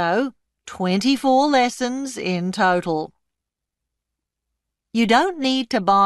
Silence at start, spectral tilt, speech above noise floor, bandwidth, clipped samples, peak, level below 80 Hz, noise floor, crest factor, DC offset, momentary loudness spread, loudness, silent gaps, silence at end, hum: 0 s; -4.5 dB/octave; 64 dB; 12 kHz; under 0.1%; -2 dBFS; -62 dBFS; -83 dBFS; 18 dB; under 0.1%; 10 LU; -20 LUFS; none; 0 s; none